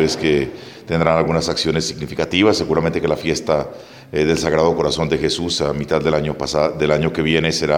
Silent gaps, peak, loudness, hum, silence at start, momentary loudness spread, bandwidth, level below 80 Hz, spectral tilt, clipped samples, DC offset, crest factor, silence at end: none; 0 dBFS; -18 LUFS; none; 0 s; 7 LU; 16 kHz; -40 dBFS; -5 dB/octave; under 0.1%; under 0.1%; 18 dB; 0 s